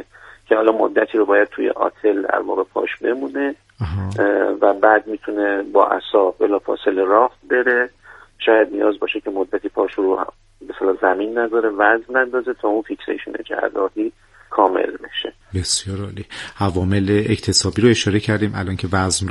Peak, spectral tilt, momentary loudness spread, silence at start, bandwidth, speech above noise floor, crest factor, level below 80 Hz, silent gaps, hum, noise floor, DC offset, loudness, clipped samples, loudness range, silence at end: 0 dBFS; -4.5 dB/octave; 11 LU; 0 s; 11.5 kHz; 23 dB; 18 dB; -50 dBFS; none; none; -41 dBFS; under 0.1%; -19 LUFS; under 0.1%; 4 LU; 0 s